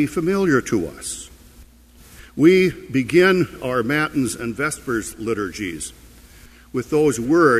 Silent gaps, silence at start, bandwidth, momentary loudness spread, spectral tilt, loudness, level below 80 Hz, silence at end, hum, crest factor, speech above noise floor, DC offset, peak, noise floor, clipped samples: none; 0 s; 15 kHz; 14 LU; -5.5 dB/octave; -20 LUFS; -46 dBFS; 0 s; none; 18 dB; 28 dB; under 0.1%; -2 dBFS; -47 dBFS; under 0.1%